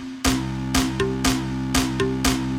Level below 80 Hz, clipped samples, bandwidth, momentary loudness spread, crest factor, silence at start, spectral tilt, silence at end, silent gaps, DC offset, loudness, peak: -34 dBFS; under 0.1%; 16.5 kHz; 2 LU; 18 dB; 0 s; -4 dB/octave; 0 s; none; under 0.1%; -22 LUFS; -6 dBFS